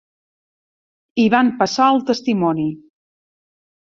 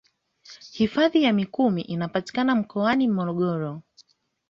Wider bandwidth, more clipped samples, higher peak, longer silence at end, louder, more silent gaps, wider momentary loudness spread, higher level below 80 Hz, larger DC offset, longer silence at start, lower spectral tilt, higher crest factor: about the same, 7.6 kHz vs 7.6 kHz; neither; first, -2 dBFS vs -8 dBFS; first, 1.2 s vs 0.7 s; first, -17 LUFS vs -24 LUFS; neither; second, 9 LU vs 12 LU; about the same, -62 dBFS vs -62 dBFS; neither; first, 1.15 s vs 0.5 s; second, -5.5 dB/octave vs -7 dB/octave; about the same, 18 dB vs 16 dB